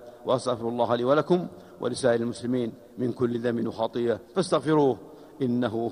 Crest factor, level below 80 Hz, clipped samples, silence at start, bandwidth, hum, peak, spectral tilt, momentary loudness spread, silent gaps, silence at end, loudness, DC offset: 18 dB; -64 dBFS; under 0.1%; 0 s; 11 kHz; none; -8 dBFS; -6.5 dB/octave; 9 LU; none; 0 s; -27 LUFS; under 0.1%